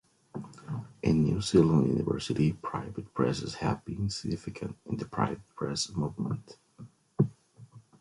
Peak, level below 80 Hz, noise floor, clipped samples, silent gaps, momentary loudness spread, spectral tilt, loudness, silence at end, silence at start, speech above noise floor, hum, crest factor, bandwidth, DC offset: -10 dBFS; -52 dBFS; -54 dBFS; under 0.1%; none; 15 LU; -6.5 dB/octave; -31 LUFS; 0.2 s; 0.35 s; 24 dB; none; 20 dB; 11.5 kHz; under 0.1%